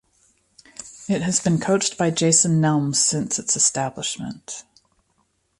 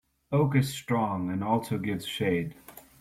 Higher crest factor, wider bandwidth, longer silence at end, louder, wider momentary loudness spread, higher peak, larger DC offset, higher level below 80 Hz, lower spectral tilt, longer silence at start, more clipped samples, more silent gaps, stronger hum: about the same, 18 dB vs 16 dB; second, 11.5 kHz vs 16 kHz; first, 1 s vs 0.2 s; first, -20 LUFS vs -29 LUFS; first, 19 LU vs 6 LU; first, -4 dBFS vs -12 dBFS; neither; about the same, -58 dBFS vs -60 dBFS; second, -3.5 dB/octave vs -6.5 dB/octave; first, 0.8 s vs 0.3 s; neither; neither; neither